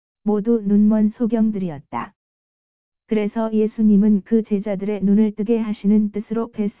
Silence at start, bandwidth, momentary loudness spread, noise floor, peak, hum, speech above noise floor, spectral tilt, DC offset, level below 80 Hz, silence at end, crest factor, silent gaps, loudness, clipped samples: 0.25 s; 3.7 kHz; 10 LU; under -90 dBFS; -6 dBFS; none; over 72 dB; -13 dB/octave; 0.8%; -58 dBFS; 0 s; 12 dB; 2.16-2.92 s; -19 LUFS; under 0.1%